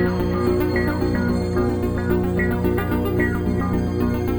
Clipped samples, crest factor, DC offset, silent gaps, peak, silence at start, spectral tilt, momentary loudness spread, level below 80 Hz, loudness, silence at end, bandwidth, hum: under 0.1%; 12 dB; under 0.1%; none; -8 dBFS; 0 s; -8 dB/octave; 2 LU; -32 dBFS; -21 LUFS; 0 s; over 20 kHz; 60 Hz at -25 dBFS